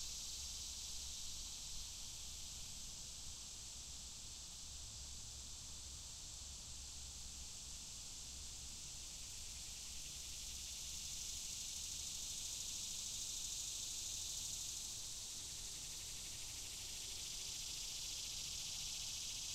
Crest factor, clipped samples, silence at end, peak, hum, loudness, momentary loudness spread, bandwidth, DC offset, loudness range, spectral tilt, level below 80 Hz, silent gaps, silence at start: 16 dB; under 0.1%; 0 s; -32 dBFS; none; -46 LUFS; 7 LU; 16 kHz; under 0.1%; 6 LU; 0 dB/octave; -60 dBFS; none; 0 s